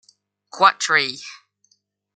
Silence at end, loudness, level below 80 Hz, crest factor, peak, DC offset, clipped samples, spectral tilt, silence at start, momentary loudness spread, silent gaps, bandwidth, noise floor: 0.85 s; -18 LUFS; -78 dBFS; 22 dB; -2 dBFS; under 0.1%; under 0.1%; -1 dB/octave; 0.55 s; 20 LU; none; 9.4 kHz; -65 dBFS